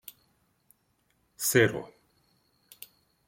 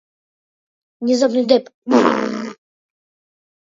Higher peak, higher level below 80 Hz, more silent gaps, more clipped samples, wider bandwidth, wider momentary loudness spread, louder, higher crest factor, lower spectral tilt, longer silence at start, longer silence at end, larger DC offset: second, -8 dBFS vs 0 dBFS; about the same, -68 dBFS vs -68 dBFS; second, none vs 1.74-1.82 s; neither; first, 16.5 kHz vs 7.8 kHz; first, 26 LU vs 12 LU; second, -26 LUFS vs -17 LUFS; first, 26 dB vs 20 dB; about the same, -4 dB/octave vs -4.5 dB/octave; first, 1.4 s vs 1 s; first, 1.4 s vs 1.1 s; neither